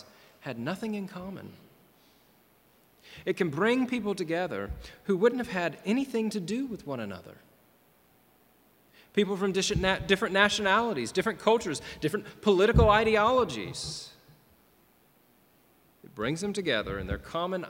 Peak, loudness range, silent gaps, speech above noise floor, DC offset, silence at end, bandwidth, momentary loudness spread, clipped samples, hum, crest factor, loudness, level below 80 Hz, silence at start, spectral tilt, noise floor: -6 dBFS; 10 LU; none; 35 dB; under 0.1%; 0 s; 16.5 kHz; 17 LU; under 0.1%; none; 24 dB; -28 LUFS; -44 dBFS; 0.45 s; -5 dB/octave; -63 dBFS